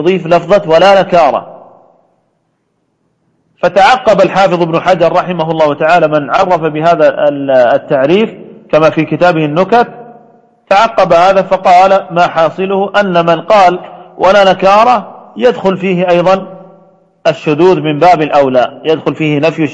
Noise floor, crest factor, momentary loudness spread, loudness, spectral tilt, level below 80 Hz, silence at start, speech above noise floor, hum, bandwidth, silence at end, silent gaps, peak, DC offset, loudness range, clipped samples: -61 dBFS; 10 dB; 7 LU; -9 LUFS; -6 dB/octave; -46 dBFS; 0 s; 53 dB; none; 9.2 kHz; 0 s; none; 0 dBFS; under 0.1%; 3 LU; 0.5%